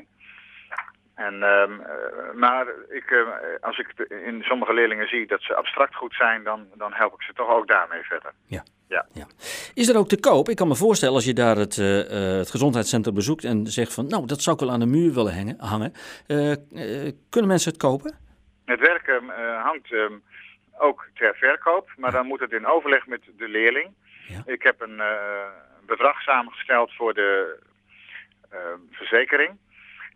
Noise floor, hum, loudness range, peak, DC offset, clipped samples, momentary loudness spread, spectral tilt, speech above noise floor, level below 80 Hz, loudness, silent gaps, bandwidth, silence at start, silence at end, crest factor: -49 dBFS; none; 4 LU; -2 dBFS; under 0.1%; under 0.1%; 16 LU; -4.5 dB/octave; 27 dB; -60 dBFS; -22 LUFS; none; 15.5 kHz; 0.55 s; 0.05 s; 20 dB